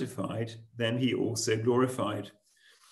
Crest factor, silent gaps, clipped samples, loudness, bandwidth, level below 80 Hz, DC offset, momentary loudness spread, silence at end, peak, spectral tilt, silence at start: 18 dB; none; under 0.1%; -31 LUFS; 13 kHz; -72 dBFS; under 0.1%; 12 LU; 0.6 s; -14 dBFS; -5 dB/octave; 0 s